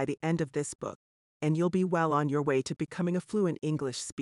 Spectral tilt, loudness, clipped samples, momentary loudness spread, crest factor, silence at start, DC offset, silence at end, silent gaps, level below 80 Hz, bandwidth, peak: -6 dB/octave; -30 LUFS; under 0.1%; 8 LU; 14 dB; 0 s; under 0.1%; 0 s; 0.75-0.79 s, 0.95-1.40 s, 4.12-4.17 s; -68 dBFS; 11.5 kHz; -16 dBFS